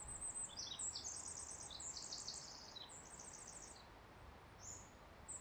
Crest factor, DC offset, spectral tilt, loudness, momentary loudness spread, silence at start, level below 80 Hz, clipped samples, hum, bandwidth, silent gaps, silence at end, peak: 18 dB; under 0.1%; -1 dB/octave; -49 LUFS; 16 LU; 0 s; -68 dBFS; under 0.1%; none; over 20 kHz; none; 0 s; -34 dBFS